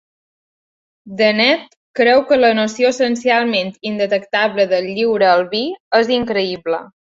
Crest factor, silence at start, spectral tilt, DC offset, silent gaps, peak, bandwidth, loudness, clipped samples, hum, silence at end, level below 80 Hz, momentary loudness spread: 14 dB; 1.05 s; -4 dB/octave; under 0.1%; 1.76-1.94 s, 5.80-5.91 s; -2 dBFS; 7.8 kHz; -16 LUFS; under 0.1%; none; 0.25 s; -60 dBFS; 9 LU